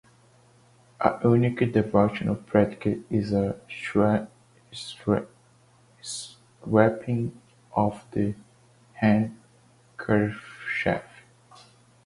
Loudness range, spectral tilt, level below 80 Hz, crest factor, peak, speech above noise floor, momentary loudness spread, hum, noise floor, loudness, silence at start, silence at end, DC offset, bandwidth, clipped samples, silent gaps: 4 LU; -7 dB/octave; -54 dBFS; 22 dB; -4 dBFS; 35 dB; 16 LU; none; -59 dBFS; -26 LUFS; 1 s; 1 s; under 0.1%; 11.5 kHz; under 0.1%; none